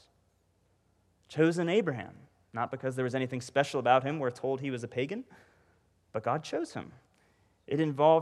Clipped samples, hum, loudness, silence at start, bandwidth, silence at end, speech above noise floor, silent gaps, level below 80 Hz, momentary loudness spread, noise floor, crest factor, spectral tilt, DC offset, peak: under 0.1%; none; -31 LUFS; 1.3 s; 12.5 kHz; 0 s; 41 dB; none; -74 dBFS; 15 LU; -71 dBFS; 22 dB; -6 dB/octave; under 0.1%; -10 dBFS